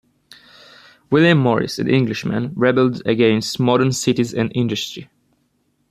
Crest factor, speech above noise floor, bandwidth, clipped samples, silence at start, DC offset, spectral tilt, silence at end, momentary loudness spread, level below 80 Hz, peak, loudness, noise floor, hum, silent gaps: 16 dB; 48 dB; 14.5 kHz; under 0.1%; 1.1 s; under 0.1%; -5.5 dB/octave; 0.85 s; 8 LU; -56 dBFS; -2 dBFS; -18 LUFS; -65 dBFS; none; none